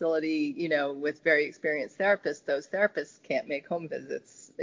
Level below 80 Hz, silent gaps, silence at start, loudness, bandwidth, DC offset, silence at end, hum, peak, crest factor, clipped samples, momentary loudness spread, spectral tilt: -78 dBFS; none; 0 s; -29 LUFS; 7.6 kHz; under 0.1%; 0 s; none; -12 dBFS; 18 dB; under 0.1%; 11 LU; -5 dB/octave